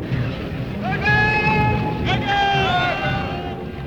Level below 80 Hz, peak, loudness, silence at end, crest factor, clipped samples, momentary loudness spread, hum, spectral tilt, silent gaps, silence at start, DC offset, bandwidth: -36 dBFS; -6 dBFS; -20 LUFS; 0 s; 14 dB; under 0.1%; 11 LU; none; -6.5 dB/octave; none; 0 s; 0.3%; 18 kHz